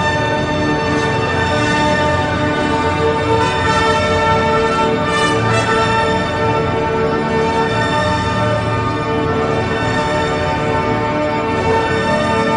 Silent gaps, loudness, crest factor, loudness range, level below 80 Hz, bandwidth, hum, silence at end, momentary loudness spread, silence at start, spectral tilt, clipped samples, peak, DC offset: none; -15 LUFS; 14 dB; 2 LU; -34 dBFS; 10 kHz; none; 0 s; 3 LU; 0 s; -5.5 dB/octave; under 0.1%; -2 dBFS; under 0.1%